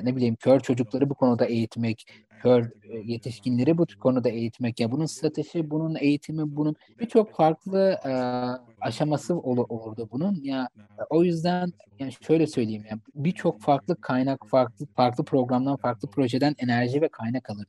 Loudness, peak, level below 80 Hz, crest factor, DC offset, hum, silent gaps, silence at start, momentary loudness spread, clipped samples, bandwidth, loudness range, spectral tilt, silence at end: -26 LUFS; -8 dBFS; -70 dBFS; 18 dB; under 0.1%; none; none; 0 s; 10 LU; under 0.1%; 12 kHz; 2 LU; -7.5 dB/octave; 0.05 s